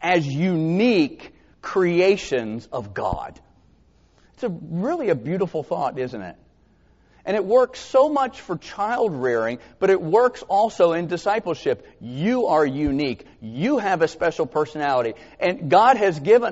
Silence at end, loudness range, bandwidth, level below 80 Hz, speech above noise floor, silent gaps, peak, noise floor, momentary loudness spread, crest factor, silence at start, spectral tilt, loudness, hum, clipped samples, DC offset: 0 s; 6 LU; 8 kHz; -52 dBFS; 36 dB; none; -2 dBFS; -57 dBFS; 12 LU; 20 dB; 0 s; -5 dB/octave; -22 LUFS; none; under 0.1%; under 0.1%